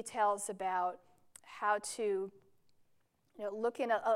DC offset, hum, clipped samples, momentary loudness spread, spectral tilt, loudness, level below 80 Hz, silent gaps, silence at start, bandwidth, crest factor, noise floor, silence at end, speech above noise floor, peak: under 0.1%; none; under 0.1%; 12 LU; -3 dB/octave; -36 LUFS; -86 dBFS; none; 0 s; 16 kHz; 16 dB; -73 dBFS; 0 s; 38 dB; -20 dBFS